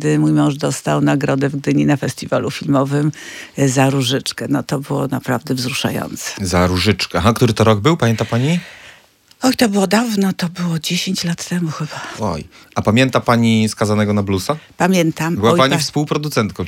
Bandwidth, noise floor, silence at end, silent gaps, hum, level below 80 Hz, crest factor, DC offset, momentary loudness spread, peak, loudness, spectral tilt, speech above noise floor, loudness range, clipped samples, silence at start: 17 kHz; -48 dBFS; 0 s; none; none; -50 dBFS; 16 dB; under 0.1%; 8 LU; 0 dBFS; -17 LUFS; -5.5 dB/octave; 32 dB; 3 LU; under 0.1%; 0 s